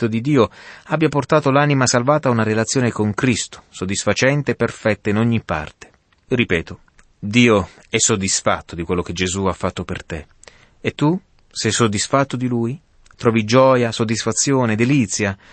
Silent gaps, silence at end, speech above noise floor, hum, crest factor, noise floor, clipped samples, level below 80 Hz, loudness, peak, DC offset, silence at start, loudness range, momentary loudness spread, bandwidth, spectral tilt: none; 0.2 s; 29 dB; none; 16 dB; -47 dBFS; under 0.1%; -46 dBFS; -18 LUFS; -2 dBFS; under 0.1%; 0 s; 4 LU; 12 LU; 8.8 kHz; -4.5 dB/octave